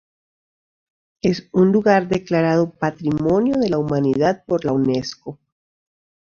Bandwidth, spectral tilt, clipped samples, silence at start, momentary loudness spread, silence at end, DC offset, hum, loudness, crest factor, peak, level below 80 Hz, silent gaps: 7.4 kHz; -7.5 dB/octave; under 0.1%; 1.25 s; 7 LU; 0.9 s; under 0.1%; none; -19 LUFS; 18 dB; -2 dBFS; -52 dBFS; none